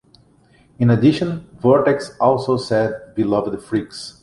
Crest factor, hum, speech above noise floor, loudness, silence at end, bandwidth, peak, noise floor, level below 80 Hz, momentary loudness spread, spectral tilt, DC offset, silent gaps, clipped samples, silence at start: 16 dB; none; 36 dB; -18 LUFS; 0.1 s; 11.5 kHz; -2 dBFS; -53 dBFS; -52 dBFS; 9 LU; -7.5 dB/octave; under 0.1%; none; under 0.1%; 0.8 s